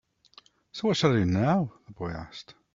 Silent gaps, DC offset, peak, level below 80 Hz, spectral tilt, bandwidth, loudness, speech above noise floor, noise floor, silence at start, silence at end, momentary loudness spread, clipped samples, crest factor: none; under 0.1%; -8 dBFS; -56 dBFS; -6.5 dB/octave; 7.6 kHz; -27 LUFS; 31 dB; -58 dBFS; 0.75 s; 0.35 s; 19 LU; under 0.1%; 20 dB